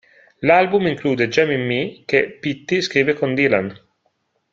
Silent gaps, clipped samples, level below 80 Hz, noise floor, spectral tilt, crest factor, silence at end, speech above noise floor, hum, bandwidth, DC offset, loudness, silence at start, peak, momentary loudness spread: none; under 0.1%; -58 dBFS; -68 dBFS; -5.5 dB/octave; 18 dB; 0.75 s; 50 dB; none; 7.6 kHz; under 0.1%; -18 LUFS; 0.4 s; 0 dBFS; 8 LU